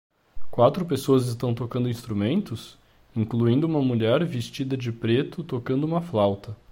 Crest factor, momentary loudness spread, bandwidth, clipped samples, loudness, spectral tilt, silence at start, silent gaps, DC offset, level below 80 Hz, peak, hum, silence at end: 18 dB; 9 LU; 16.5 kHz; under 0.1%; -25 LUFS; -7.5 dB/octave; 0.35 s; none; under 0.1%; -54 dBFS; -6 dBFS; none; 0.15 s